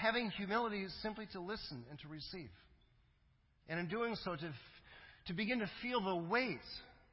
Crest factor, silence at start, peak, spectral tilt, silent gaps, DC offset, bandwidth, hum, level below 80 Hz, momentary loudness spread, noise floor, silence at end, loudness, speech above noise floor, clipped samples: 22 dB; 0 s; -22 dBFS; -3 dB/octave; none; under 0.1%; 5.6 kHz; none; -68 dBFS; 15 LU; -73 dBFS; 0.15 s; -41 LUFS; 32 dB; under 0.1%